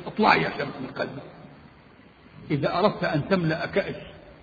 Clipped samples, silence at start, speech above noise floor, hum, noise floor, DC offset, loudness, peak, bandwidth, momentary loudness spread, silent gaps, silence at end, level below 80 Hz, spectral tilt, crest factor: under 0.1%; 0 s; 27 dB; none; -52 dBFS; under 0.1%; -25 LUFS; -4 dBFS; 7 kHz; 19 LU; none; 0.1 s; -56 dBFS; -7.5 dB/octave; 24 dB